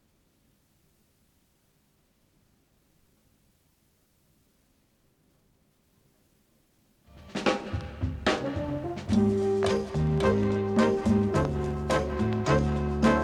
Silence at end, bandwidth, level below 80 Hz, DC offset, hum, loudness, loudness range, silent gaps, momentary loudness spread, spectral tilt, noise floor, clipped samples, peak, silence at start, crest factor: 0 s; 11.5 kHz; -42 dBFS; under 0.1%; none; -27 LUFS; 11 LU; none; 8 LU; -6.5 dB/octave; -68 dBFS; under 0.1%; -10 dBFS; 7.15 s; 20 dB